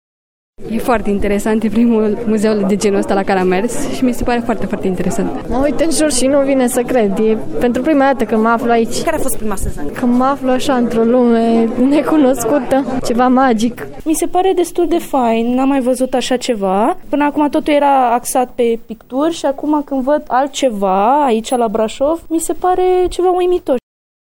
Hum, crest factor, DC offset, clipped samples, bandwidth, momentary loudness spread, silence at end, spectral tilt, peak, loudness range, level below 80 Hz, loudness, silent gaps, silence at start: none; 12 dB; under 0.1%; under 0.1%; 17 kHz; 6 LU; 0.55 s; -5 dB/octave; 0 dBFS; 2 LU; -32 dBFS; -14 LUFS; none; 0.6 s